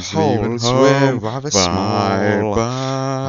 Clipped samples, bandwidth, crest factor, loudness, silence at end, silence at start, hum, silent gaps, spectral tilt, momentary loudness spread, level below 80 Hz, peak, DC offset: under 0.1%; 7.8 kHz; 16 dB; -16 LUFS; 0 s; 0 s; none; none; -5 dB/octave; 7 LU; -42 dBFS; 0 dBFS; under 0.1%